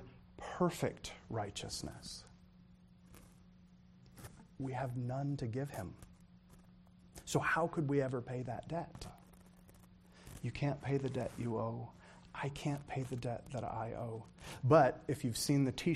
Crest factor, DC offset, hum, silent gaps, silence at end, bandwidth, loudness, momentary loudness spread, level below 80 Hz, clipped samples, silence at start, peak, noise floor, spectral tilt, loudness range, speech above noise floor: 26 dB; under 0.1%; none; none; 0 s; 14.5 kHz; -38 LUFS; 19 LU; -62 dBFS; under 0.1%; 0 s; -14 dBFS; -62 dBFS; -6 dB/octave; 11 LU; 25 dB